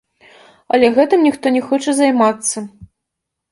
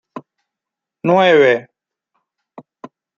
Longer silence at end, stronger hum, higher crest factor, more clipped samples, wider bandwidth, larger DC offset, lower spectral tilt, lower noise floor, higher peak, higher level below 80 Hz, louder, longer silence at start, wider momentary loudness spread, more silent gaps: second, 0.65 s vs 1.55 s; neither; about the same, 16 dB vs 18 dB; neither; first, 11.5 kHz vs 7.2 kHz; neither; second, -3.5 dB/octave vs -6.5 dB/octave; second, -79 dBFS vs -84 dBFS; about the same, 0 dBFS vs -2 dBFS; first, -58 dBFS vs -68 dBFS; about the same, -14 LUFS vs -13 LUFS; first, 0.75 s vs 0.15 s; second, 8 LU vs 26 LU; neither